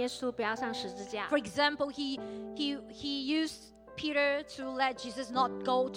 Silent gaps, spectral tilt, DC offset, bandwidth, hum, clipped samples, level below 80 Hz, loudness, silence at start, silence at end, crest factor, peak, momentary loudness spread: none; -3.5 dB/octave; under 0.1%; 16.5 kHz; none; under 0.1%; -66 dBFS; -33 LUFS; 0 s; 0 s; 18 dB; -14 dBFS; 9 LU